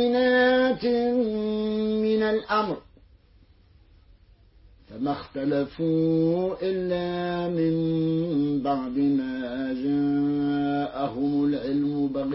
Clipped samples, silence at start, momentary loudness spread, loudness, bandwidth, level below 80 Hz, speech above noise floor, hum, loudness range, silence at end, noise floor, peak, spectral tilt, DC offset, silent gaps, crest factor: under 0.1%; 0 s; 7 LU; -25 LUFS; 5.8 kHz; -54 dBFS; 32 dB; none; 5 LU; 0 s; -57 dBFS; -10 dBFS; -11 dB/octave; under 0.1%; none; 16 dB